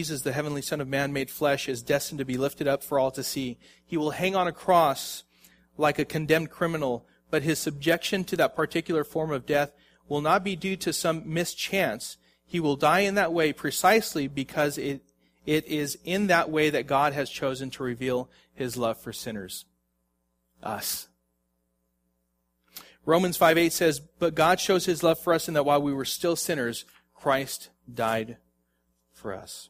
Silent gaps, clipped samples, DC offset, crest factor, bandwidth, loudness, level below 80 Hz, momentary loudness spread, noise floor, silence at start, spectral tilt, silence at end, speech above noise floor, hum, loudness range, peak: none; under 0.1%; under 0.1%; 22 dB; 15.5 kHz; -26 LUFS; -60 dBFS; 14 LU; -75 dBFS; 0 s; -4 dB/octave; 0.05 s; 49 dB; none; 9 LU; -6 dBFS